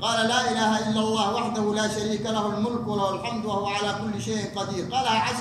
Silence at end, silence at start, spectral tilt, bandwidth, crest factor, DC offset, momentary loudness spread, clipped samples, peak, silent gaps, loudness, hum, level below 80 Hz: 0 s; 0 s; -4 dB/octave; 12.5 kHz; 16 dB; under 0.1%; 6 LU; under 0.1%; -10 dBFS; none; -25 LUFS; none; -58 dBFS